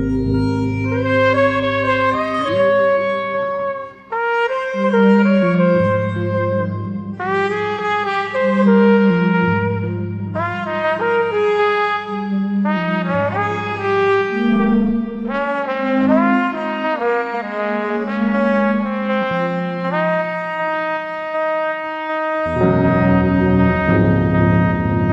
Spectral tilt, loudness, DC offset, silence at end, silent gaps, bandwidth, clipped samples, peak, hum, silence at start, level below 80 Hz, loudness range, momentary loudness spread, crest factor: -8.5 dB/octave; -17 LUFS; under 0.1%; 0 s; none; 8 kHz; under 0.1%; -2 dBFS; none; 0 s; -40 dBFS; 3 LU; 7 LU; 16 dB